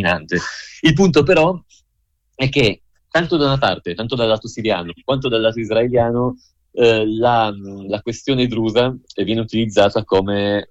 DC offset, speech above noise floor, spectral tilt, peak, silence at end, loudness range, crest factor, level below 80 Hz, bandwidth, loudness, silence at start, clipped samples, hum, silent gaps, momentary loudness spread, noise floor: under 0.1%; 50 dB; -6 dB/octave; -2 dBFS; 0.05 s; 2 LU; 14 dB; -42 dBFS; 9.8 kHz; -17 LUFS; 0 s; under 0.1%; none; none; 10 LU; -67 dBFS